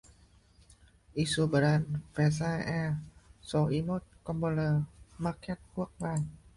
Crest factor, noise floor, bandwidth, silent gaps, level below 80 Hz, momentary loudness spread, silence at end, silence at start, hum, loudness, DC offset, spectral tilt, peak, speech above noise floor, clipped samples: 16 dB; -61 dBFS; 11.5 kHz; none; -56 dBFS; 12 LU; 0.2 s; 1.15 s; none; -32 LUFS; under 0.1%; -6.5 dB/octave; -16 dBFS; 31 dB; under 0.1%